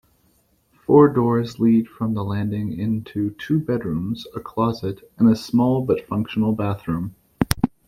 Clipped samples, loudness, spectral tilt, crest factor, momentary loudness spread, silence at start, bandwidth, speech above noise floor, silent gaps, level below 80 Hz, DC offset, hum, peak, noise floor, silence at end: under 0.1%; -21 LUFS; -7.5 dB/octave; 20 dB; 11 LU; 0.9 s; 16 kHz; 42 dB; none; -44 dBFS; under 0.1%; none; 0 dBFS; -62 dBFS; 0.2 s